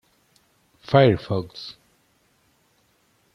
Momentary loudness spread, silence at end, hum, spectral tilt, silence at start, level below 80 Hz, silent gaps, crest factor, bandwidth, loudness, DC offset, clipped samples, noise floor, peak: 21 LU; 1.65 s; none; -8 dB/octave; 0.9 s; -56 dBFS; none; 22 dB; 10 kHz; -20 LUFS; under 0.1%; under 0.1%; -64 dBFS; -2 dBFS